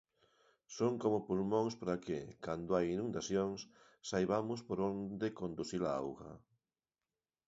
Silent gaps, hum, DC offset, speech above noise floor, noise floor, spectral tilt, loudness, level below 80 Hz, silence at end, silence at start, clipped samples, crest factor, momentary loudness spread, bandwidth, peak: none; none; under 0.1%; over 52 dB; under -90 dBFS; -6 dB/octave; -38 LUFS; -68 dBFS; 1.1 s; 0.7 s; under 0.1%; 20 dB; 11 LU; 7.6 kHz; -20 dBFS